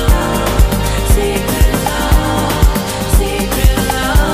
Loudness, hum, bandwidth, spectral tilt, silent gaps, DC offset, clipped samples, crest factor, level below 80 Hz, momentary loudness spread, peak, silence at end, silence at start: -14 LUFS; none; 15.5 kHz; -5 dB/octave; none; under 0.1%; under 0.1%; 12 dB; -14 dBFS; 2 LU; 0 dBFS; 0 s; 0 s